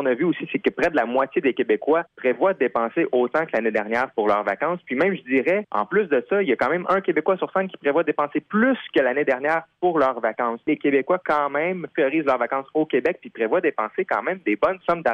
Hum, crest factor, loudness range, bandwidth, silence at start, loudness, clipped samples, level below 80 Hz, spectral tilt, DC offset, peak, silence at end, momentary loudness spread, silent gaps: none; 14 dB; 1 LU; 7.8 kHz; 0 s; -22 LUFS; under 0.1%; -62 dBFS; -7.5 dB/octave; under 0.1%; -8 dBFS; 0 s; 4 LU; none